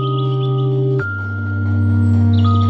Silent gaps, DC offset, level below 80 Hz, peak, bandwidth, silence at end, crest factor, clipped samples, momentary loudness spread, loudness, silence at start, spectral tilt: none; under 0.1%; -50 dBFS; -4 dBFS; 4.7 kHz; 0 s; 10 dB; under 0.1%; 8 LU; -17 LUFS; 0 s; -9.5 dB/octave